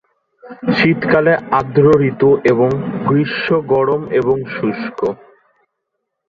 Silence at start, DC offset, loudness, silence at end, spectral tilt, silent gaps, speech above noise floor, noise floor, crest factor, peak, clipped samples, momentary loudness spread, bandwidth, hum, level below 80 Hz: 0.45 s; under 0.1%; -15 LUFS; 1.15 s; -8.5 dB/octave; none; 60 dB; -75 dBFS; 14 dB; -2 dBFS; under 0.1%; 9 LU; 7 kHz; none; -50 dBFS